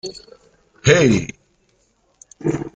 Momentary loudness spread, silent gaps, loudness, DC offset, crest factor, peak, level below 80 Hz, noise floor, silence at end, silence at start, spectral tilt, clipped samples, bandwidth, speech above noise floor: 19 LU; none; -17 LUFS; under 0.1%; 20 dB; 0 dBFS; -48 dBFS; -62 dBFS; 0.05 s; 0.05 s; -5 dB/octave; under 0.1%; 9.2 kHz; 45 dB